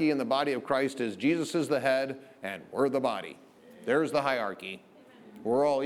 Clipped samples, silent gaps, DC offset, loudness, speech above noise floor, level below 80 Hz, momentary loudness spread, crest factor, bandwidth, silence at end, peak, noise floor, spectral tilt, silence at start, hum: under 0.1%; none; under 0.1%; -29 LUFS; 24 dB; -76 dBFS; 13 LU; 18 dB; 14 kHz; 0 s; -12 dBFS; -53 dBFS; -5 dB/octave; 0 s; none